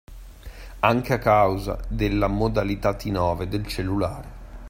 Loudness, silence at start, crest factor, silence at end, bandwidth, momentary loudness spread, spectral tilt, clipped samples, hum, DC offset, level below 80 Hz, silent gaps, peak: -23 LUFS; 0.1 s; 22 dB; 0 s; 16 kHz; 22 LU; -7 dB/octave; under 0.1%; none; under 0.1%; -36 dBFS; none; -2 dBFS